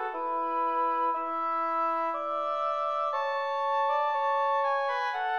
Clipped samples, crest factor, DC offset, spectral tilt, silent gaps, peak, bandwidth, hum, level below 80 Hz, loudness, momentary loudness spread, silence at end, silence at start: under 0.1%; 10 dB; 0.1%; -2 dB/octave; none; -18 dBFS; 7 kHz; none; -86 dBFS; -29 LUFS; 3 LU; 0 s; 0 s